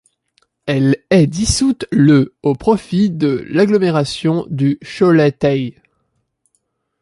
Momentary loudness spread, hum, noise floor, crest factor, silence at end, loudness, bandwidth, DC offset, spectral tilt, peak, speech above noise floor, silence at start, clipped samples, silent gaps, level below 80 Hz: 6 LU; none; -67 dBFS; 14 dB; 1.3 s; -15 LUFS; 11.5 kHz; under 0.1%; -6 dB/octave; -2 dBFS; 53 dB; 0.65 s; under 0.1%; none; -38 dBFS